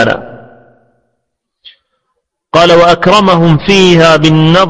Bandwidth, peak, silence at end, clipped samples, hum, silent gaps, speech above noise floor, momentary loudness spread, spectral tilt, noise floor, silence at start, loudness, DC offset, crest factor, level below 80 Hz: 10.5 kHz; 0 dBFS; 0 s; 1%; none; none; 64 dB; 7 LU; -5.5 dB/octave; -69 dBFS; 0 s; -6 LUFS; under 0.1%; 8 dB; -36 dBFS